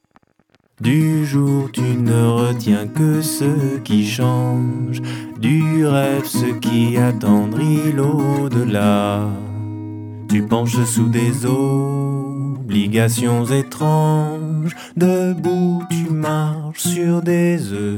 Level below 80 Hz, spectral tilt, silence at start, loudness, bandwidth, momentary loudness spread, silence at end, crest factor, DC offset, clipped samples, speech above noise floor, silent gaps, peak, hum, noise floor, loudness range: -62 dBFS; -6.5 dB/octave; 0.8 s; -18 LUFS; 18 kHz; 7 LU; 0 s; 16 dB; under 0.1%; under 0.1%; 43 dB; none; 0 dBFS; none; -59 dBFS; 2 LU